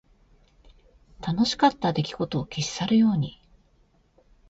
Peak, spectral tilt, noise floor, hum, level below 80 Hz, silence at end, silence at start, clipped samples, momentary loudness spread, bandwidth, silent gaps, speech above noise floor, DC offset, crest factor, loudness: -6 dBFS; -5.5 dB/octave; -63 dBFS; none; -54 dBFS; 1.2 s; 1.2 s; under 0.1%; 10 LU; 8 kHz; none; 39 dB; under 0.1%; 20 dB; -25 LUFS